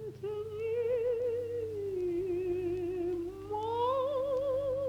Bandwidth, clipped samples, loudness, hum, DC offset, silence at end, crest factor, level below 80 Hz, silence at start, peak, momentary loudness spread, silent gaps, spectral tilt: 13 kHz; under 0.1%; -34 LUFS; none; under 0.1%; 0 s; 12 dB; -60 dBFS; 0 s; -22 dBFS; 7 LU; none; -7.5 dB/octave